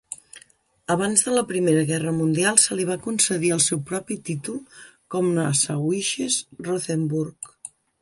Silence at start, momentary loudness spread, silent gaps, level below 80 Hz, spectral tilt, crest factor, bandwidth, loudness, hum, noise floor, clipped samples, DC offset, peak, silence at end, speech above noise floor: 0.1 s; 17 LU; none; -64 dBFS; -3.5 dB/octave; 24 dB; 11.5 kHz; -22 LUFS; none; -57 dBFS; under 0.1%; under 0.1%; 0 dBFS; 0.35 s; 34 dB